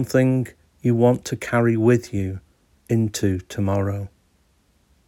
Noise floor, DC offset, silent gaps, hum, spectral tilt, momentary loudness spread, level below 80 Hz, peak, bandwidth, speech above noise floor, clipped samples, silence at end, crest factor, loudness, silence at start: -62 dBFS; under 0.1%; none; none; -7 dB/octave; 13 LU; -54 dBFS; -4 dBFS; 16.5 kHz; 42 dB; under 0.1%; 1 s; 16 dB; -22 LUFS; 0 s